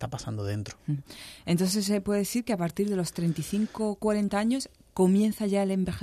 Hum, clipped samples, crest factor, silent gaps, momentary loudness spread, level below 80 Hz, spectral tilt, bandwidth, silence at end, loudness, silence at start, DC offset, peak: none; under 0.1%; 16 dB; none; 10 LU; -56 dBFS; -6 dB/octave; 14 kHz; 0 s; -28 LUFS; 0 s; under 0.1%; -12 dBFS